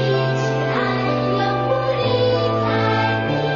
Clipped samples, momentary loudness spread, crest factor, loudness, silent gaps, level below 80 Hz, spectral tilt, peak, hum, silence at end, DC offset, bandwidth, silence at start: under 0.1%; 2 LU; 14 dB; -19 LUFS; none; -48 dBFS; -7 dB/octave; -6 dBFS; none; 0 s; under 0.1%; 7.2 kHz; 0 s